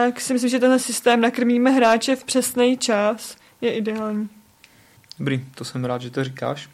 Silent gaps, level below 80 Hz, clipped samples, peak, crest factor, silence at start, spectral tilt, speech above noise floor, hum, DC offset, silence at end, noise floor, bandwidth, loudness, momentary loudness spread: none; -66 dBFS; under 0.1%; -4 dBFS; 16 dB; 0 s; -4 dB/octave; 33 dB; none; under 0.1%; 0.1 s; -53 dBFS; 14.5 kHz; -21 LUFS; 11 LU